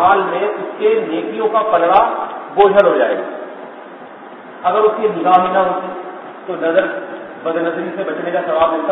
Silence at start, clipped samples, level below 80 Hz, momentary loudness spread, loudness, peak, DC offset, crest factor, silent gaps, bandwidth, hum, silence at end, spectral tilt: 0 s; under 0.1%; -56 dBFS; 19 LU; -15 LUFS; 0 dBFS; under 0.1%; 16 dB; none; 4.1 kHz; none; 0 s; -8 dB/octave